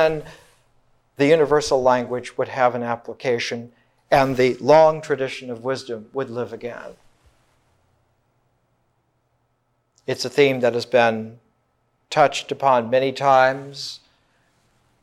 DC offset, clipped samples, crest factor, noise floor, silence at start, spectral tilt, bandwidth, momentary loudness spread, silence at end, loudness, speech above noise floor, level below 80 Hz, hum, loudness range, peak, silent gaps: under 0.1%; under 0.1%; 20 dB; -69 dBFS; 0 s; -5 dB/octave; 14 kHz; 16 LU; 1.05 s; -20 LUFS; 49 dB; -56 dBFS; none; 13 LU; -2 dBFS; none